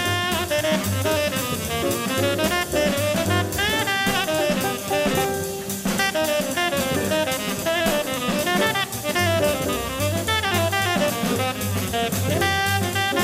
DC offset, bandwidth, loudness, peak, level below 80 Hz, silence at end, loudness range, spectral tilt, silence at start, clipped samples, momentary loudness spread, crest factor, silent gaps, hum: under 0.1%; 16 kHz; -22 LUFS; -8 dBFS; -44 dBFS; 0 s; 1 LU; -3.5 dB/octave; 0 s; under 0.1%; 4 LU; 14 dB; none; none